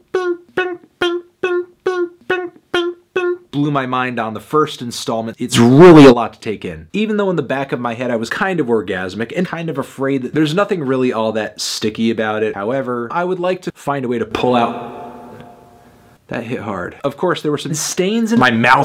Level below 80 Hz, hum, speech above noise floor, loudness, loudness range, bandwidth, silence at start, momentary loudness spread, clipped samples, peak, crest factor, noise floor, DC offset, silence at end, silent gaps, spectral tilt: -50 dBFS; none; 32 dB; -16 LUFS; 10 LU; 15.5 kHz; 0.15 s; 11 LU; under 0.1%; 0 dBFS; 16 dB; -47 dBFS; under 0.1%; 0 s; none; -5.5 dB/octave